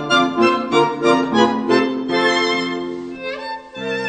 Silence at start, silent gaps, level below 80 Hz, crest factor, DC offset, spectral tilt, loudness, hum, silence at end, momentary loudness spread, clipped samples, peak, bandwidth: 0 s; none; -58 dBFS; 18 dB; under 0.1%; -4.5 dB/octave; -17 LUFS; none; 0 s; 12 LU; under 0.1%; 0 dBFS; 9 kHz